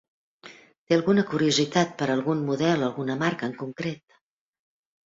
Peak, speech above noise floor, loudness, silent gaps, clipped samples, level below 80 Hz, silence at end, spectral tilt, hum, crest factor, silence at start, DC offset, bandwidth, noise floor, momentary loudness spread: -8 dBFS; 25 dB; -25 LUFS; 0.78-0.87 s; under 0.1%; -64 dBFS; 1.1 s; -5 dB/octave; none; 20 dB; 0.45 s; under 0.1%; 7.8 kHz; -50 dBFS; 11 LU